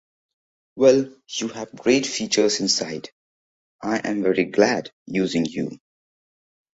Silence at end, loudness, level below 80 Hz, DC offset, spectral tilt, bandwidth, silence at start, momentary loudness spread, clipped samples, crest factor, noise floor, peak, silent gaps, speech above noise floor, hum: 1 s; -22 LUFS; -64 dBFS; under 0.1%; -3.5 dB/octave; 8.2 kHz; 0.75 s; 13 LU; under 0.1%; 20 dB; under -90 dBFS; -4 dBFS; 3.12-3.79 s, 4.93-5.06 s; over 69 dB; none